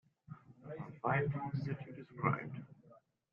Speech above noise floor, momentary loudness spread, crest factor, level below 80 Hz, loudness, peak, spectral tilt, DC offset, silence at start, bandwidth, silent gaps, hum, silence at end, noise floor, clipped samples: 29 dB; 21 LU; 24 dB; -74 dBFS; -39 LUFS; -18 dBFS; -7.5 dB/octave; under 0.1%; 0.3 s; 5.6 kHz; none; none; 0.35 s; -66 dBFS; under 0.1%